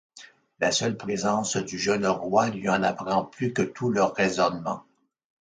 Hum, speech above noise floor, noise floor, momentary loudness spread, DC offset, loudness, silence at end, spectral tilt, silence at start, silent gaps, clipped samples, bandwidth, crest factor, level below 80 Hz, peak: none; 26 dB; -51 dBFS; 5 LU; under 0.1%; -26 LUFS; 0.6 s; -4 dB/octave; 0.15 s; none; under 0.1%; 9.6 kHz; 18 dB; -62 dBFS; -8 dBFS